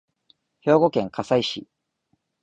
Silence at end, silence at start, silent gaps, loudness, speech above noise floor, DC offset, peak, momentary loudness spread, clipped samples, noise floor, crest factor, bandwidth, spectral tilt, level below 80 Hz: 0.8 s; 0.65 s; none; -22 LUFS; 51 dB; under 0.1%; -4 dBFS; 11 LU; under 0.1%; -72 dBFS; 20 dB; 8.8 kHz; -6 dB/octave; -62 dBFS